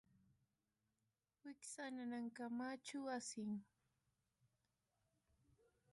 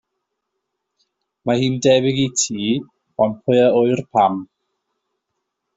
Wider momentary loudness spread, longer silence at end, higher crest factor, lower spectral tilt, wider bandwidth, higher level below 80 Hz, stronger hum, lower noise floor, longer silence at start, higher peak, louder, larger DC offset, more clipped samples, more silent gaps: about the same, 8 LU vs 9 LU; first, 2.3 s vs 1.35 s; about the same, 16 dB vs 18 dB; about the same, -4 dB/octave vs -4.5 dB/octave; first, 11.5 kHz vs 8 kHz; second, under -90 dBFS vs -60 dBFS; neither; first, under -90 dBFS vs -77 dBFS; about the same, 1.45 s vs 1.45 s; second, -38 dBFS vs -2 dBFS; second, -49 LUFS vs -18 LUFS; neither; neither; neither